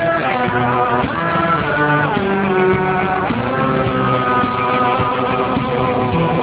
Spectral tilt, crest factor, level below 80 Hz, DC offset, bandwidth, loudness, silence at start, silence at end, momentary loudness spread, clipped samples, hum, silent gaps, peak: -10 dB/octave; 14 dB; -38 dBFS; under 0.1%; 4 kHz; -16 LUFS; 0 s; 0 s; 3 LU; under 0.1%; none; none; -2 dBFS